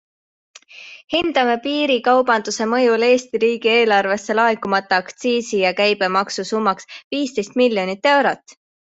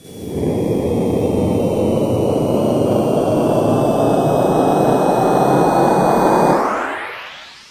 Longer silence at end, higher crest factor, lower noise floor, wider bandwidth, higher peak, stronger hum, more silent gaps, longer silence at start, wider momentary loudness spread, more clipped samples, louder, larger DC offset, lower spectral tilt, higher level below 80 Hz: first, 0.4 s vs 0.15 s; about the same, 16 dB vs 16 dB; first, -41 dBFS vs -35 dBFS; second, 8.2 kHz vs 16 kHz; about the same, -2 dBFS vs 0 dBFS; neither; first, 1.04-1.08 s, 7.04-7.11 s vs none; first, 0.75 s vs 0.05 s; about the same, 7 LU vs 9 LU; neither; about the same, -18 LUFS vs -16 LUFS; neither; second, -3.5 dB/octave vs -7 dB/octave; second, -62 dBFS vs -38 dBFS